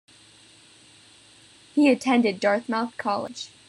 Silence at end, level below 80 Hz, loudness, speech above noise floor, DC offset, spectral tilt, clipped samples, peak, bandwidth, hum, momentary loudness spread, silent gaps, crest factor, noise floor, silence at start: 0.2 s; -74 dBFS; -23 LUFS; 30 dB; under 0.1%; -4.5 dB/octave; under 0.1%; -8 dBFS; 11.5 kHz; none; 9 LU; none; 18 dB; -53 dBFS; 1.75 s